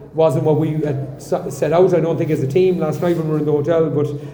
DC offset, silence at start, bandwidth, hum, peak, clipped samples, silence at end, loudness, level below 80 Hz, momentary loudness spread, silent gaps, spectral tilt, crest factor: under 0.1%; 0 s; over 20 kHz; none; -2 dBFS; under 0.1%; 0 s; -17 LUFS; -50 dBFS; 8 LU; none; -8 dB/octave; 14 dB